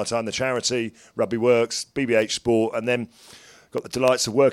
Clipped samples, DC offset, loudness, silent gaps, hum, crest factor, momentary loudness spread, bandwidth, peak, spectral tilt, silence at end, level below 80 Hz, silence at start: under 0.1%; under 0.1%; -23 LUFS; none; none; 20 dB; 11 LU; 16 kHz; -2 dBFS; -4 dB/octave; 0 s; -58 dBFS; 0 s